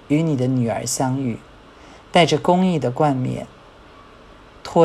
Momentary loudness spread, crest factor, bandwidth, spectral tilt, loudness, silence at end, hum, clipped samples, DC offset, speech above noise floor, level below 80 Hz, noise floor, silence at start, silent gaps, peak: 14 LU; 20 dB; 13.5 kHz; -5.5 dB/octave; -20 LUFS; 0 s; none; under 0.1%; under 0.1%; 26 dB; -52 dBFS; -45 dBFS; 0.1 s; none; -2 dBFS